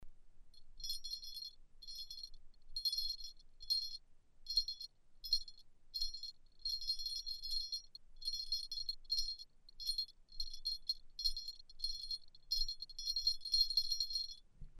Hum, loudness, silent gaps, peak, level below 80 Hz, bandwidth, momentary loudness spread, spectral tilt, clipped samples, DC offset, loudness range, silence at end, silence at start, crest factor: none; -40 LUFS; none; -20 dBFS; -52 dBFS; 15 kHz; 15 LU; 1 dB/octave; under 0.1%; under 0.1%; 5 LU; 0 s; 0 s; 22 dB